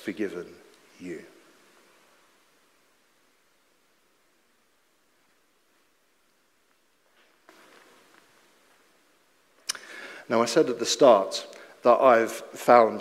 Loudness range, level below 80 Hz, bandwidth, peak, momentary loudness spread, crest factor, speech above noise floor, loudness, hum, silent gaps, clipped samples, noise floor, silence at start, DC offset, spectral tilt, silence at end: 27 LU; -80 dBFS; 15.5 kHz; -4 dBFS; 23 LU; 24 dB; 46 dB; -23 LUFS; none; none; under 0.1%; -68 dBFS; 0.05 s; under 0.1%; -3.5 dB/octave; 0 s